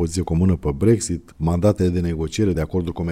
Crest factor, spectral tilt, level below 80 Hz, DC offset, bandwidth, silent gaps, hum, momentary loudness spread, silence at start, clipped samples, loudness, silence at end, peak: 14 dB; -7 dB/octave; -34 dBFS; under 0.1%; 14.5 kHz; none; none; 6 LU; 0 s; under 0.1%; -21 LUFS; 0 s; -6 dBFS